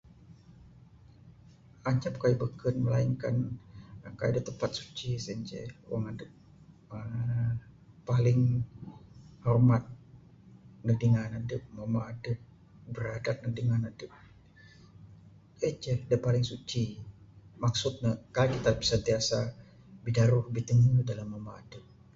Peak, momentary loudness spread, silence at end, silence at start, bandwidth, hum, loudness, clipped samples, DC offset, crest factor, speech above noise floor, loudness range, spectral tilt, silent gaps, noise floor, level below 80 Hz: -12 dBFS; 19 LU; 0.35 s; 0.3 s; 7.8 kHz; none; -31 LUFS; under 0.1%; under 0.1%; 20 dB; 27 dB; 7 LU; -6.5 dB/octave; none; -56 dBFS; -54 dBFS